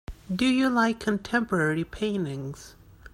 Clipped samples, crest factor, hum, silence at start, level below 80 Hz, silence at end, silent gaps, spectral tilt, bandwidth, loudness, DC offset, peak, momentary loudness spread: under 0.1%; 16 dB; none; 0.1 s; -50 dBFS; 0.05 s; none; -5.5 dB/octave; 15.5 kHz; -26 LUFS; under 0.1%; -10 dBFS; 13 LU